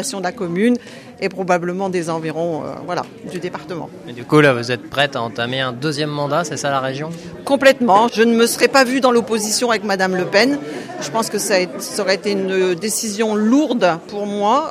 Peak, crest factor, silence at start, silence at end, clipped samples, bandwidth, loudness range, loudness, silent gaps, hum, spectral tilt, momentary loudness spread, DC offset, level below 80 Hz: 0 dBFS; 18 dB; 0 s; 0 s; under 0.1%; 15.5 kHz; 6 LU; -17 LUFS; none; none; -4 dB/octave; 13 LU; under 0.1%; -60 dBFS